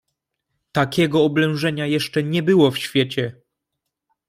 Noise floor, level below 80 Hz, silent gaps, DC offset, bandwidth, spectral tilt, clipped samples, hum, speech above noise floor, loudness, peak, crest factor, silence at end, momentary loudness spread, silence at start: -80 dBFS; -58 dBFS; none; under 0.1%; 16 kHz; -6 dB/octave; under 0.1%; none; 61 dB; -19 LUFS; -4 dBFS; 18 dB; 1 s; 7 LU; 0.75 s